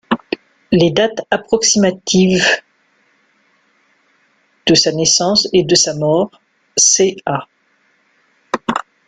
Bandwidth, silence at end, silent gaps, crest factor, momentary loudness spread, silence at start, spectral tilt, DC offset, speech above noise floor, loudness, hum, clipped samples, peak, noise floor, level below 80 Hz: 10.5 kHz; 0.25 s; none; 16 dB; 11 LU; 0.1 s; -3 dB/octave; under 0.1%; 45 dB; -13 LUFS; none; under 0.1%; 0 dBFS; -59 dBFS; -52 dBFS